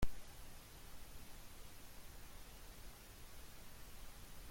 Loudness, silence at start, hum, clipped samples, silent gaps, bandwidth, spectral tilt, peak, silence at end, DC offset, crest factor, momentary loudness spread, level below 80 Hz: -57 LUFS; 0 s; none; under 0.1%; none; 16.5 kHz; -4 dB/octave; -24 dBFS; 0 s; under 0.1%; 22 dB; 1 LU; -54 dBFS